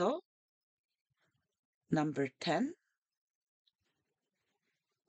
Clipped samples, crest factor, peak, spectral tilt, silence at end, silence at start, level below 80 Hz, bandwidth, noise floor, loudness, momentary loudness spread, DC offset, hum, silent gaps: under 0.1%; 22 dB; -20 dBFS; -6 dB/octave; 2.35 s; 0 s; -88 dBFS; 8.8 kHz; -87 dBFS; -36 LUFS; 5 LU; under 0.1%; none; 0.26-0.89 s, 1.01-1.05 s, 1.59-1.81 s